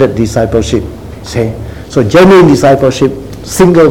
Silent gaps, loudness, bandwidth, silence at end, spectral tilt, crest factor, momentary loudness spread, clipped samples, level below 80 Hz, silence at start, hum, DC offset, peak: none; -8 LUFS; 17.5 kHz; 0 s; -6 dB/octave; 8 dB; 17 LU; 3%; -28 dBFS; 0 s; none; 0.8%; 0 dBFS